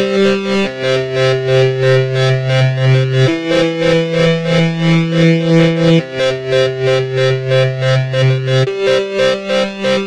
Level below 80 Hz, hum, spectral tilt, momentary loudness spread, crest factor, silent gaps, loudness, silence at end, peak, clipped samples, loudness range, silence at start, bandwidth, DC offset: -46 dBFS; none; -6.5 dB/octave; 4 LU; 12 dB; none; -13 LUFS; 0 s; 0 dBFS; under 0.1%; 2 LU; 0 s; 9.8 kHz; under 0.1%